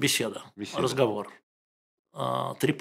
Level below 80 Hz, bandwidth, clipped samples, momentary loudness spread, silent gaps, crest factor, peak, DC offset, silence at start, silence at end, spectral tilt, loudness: -70 dBFS; 16 kHz; under 0.1%; 14 LU; 1.43-2.05 s; 20 dB; -10 dBFS; under 0.1%; 0 s; 0 s; -4 dB/octave; -29 LUFS